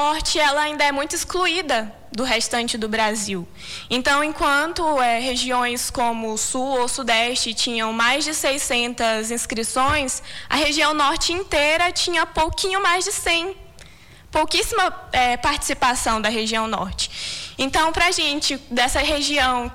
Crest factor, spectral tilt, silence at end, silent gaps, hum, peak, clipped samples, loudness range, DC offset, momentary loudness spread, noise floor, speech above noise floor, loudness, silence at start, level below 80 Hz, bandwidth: 14 dB; -1.5 dB/octave; 0 s; none; none; -8 dBFS; under 0.1%; 2 LU; under 0.1%; 7 LU; -45 dBFS; 25 dB; -20 LUFS; 0 s; -40 dBFS; 19 kHz